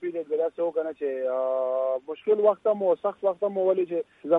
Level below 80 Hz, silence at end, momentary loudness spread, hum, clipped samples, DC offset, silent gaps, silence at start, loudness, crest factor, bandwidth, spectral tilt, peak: -78 dBFS; 0 s; 7 LU; none; under 0.1%; under 0.1%; none; 0 s; -26 LUFS; 16 dB; 3.9 kHz; -8.5 dB/octave; -8 dBFS